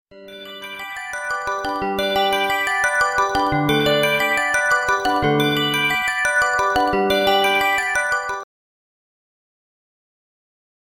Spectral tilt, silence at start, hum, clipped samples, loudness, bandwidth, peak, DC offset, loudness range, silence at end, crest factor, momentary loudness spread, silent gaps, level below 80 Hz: -3.5 dB/octave; 0.1 s; none; under 0.1%; -18 LUFS; 16.5 kHz; -4 dBFS; under 0.1%; 4 LU; 2.45 s; 16 dB; 11 LU; none; -48 dBFS